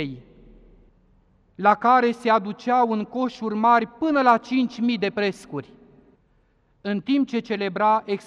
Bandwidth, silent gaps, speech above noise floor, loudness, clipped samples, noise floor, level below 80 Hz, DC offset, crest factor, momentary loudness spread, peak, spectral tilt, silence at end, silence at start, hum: 10.5 kHz; none; 41 dB; -22 LUFS; under 0.1%; -62 dBFS; -60 dBFS; under 0.1%; 18 dB; 12 LU; -4 dBFS; -6.5 dB/octave; 0.05 s; 0 s; none